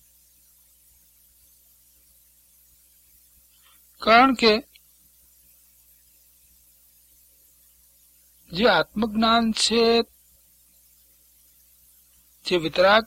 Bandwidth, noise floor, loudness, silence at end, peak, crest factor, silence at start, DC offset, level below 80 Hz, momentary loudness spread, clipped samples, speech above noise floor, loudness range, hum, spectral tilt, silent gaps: 16.5 kHz; -58 dBFS; -20 LUFS; 0 s; -4 dBFS; 22 dB; 4 s; under 0.1%; -56 dBFS; 11 LU; under 0.1%; 38 dB; 6 LU; 60 Hz at -55 dBFS; -3.5 dB/octave; none